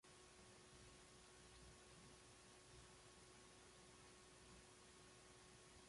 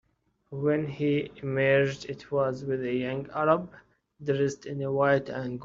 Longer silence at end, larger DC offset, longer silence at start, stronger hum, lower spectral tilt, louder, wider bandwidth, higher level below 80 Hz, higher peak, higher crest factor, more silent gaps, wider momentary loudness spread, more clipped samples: about the same, 0 s vs 0 s; neither; second, 0.05 s vs 0.5 s; neither; second, -3 dB/octave vs -5.5 dB/octave; second, -65 LUFS vs -28 LUFS; first, 11.5 kHz vs 7.6 kHz; second, -76 dBFS vs -62 dBFS; second, -52 dBFS vs -8 dBFS; second, 14 dB vs 20 dB; neither; second, 1 LU vs 10 LU; neither